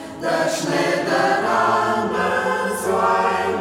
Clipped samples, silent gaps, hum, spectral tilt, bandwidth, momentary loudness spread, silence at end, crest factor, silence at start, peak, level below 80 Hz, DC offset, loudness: under 0.1%; none; none; -4 dB/octave; 16.5 kHz; 3 LU; 0 s; 14 dB; 0 s; -6 dBFS; -56 dBFS; under 0.1%; -19 LUFS